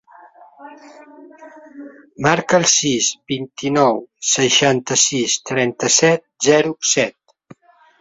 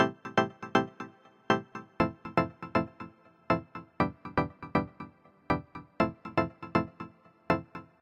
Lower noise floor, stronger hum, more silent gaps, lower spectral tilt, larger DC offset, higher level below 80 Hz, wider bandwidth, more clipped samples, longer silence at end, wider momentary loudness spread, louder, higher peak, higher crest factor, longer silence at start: about the same, -47 dBFS vs -49 dBFS; neither; neither; second, -2.5 dB/octave vs -7 dB/octave; neither; about the same, -60 dBFS vs -56 dBFS; second, 8 kHz vs 10 kHz; neither; first, 0.9 s vs 0.2 s; second, 7 LU vs 17 LU; first, -16 LUFS vs -32 LUFS; first, 0 dBFS vs -8 dBFS; second, 18 dB vs 24 dB; first, 0.6 s vs 0 s